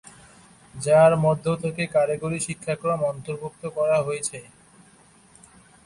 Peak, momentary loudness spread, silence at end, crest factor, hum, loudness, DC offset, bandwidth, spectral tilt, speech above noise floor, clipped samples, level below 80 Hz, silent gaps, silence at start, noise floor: -6 dBFS; 15 LU; 1.45 s; 18 dB; none; -23 LUFS; under 0.1%; 11.5 kHz; -5.5 dB/octave; 32 dB; under 0.1%; -58 dBFS; none; 0.75 s; -54 dBFS